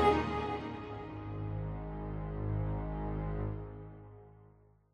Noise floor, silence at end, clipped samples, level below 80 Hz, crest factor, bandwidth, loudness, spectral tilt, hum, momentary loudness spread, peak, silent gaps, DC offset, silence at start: -62 dBFS; 0.45 s; under 0.1%; -46 dBFS; 22 dB; 9.6 kHz; -38 LUFS; -8 dB/octave; none; 15 LU; -14 dBFS; none; under 0.1%; 0 s